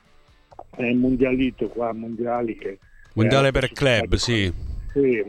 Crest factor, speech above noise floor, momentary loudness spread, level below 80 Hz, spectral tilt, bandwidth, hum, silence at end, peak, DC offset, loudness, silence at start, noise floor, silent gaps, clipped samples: 16 dB; 33 dB; 13 LU; -36 dBFS; -5.5 dB/octave; 12.5 kHz; none; 0 s; -6 dBFS; under 0.1%; -22 LUFS; 0.75 s; -54 dBFS; none; under 0.1%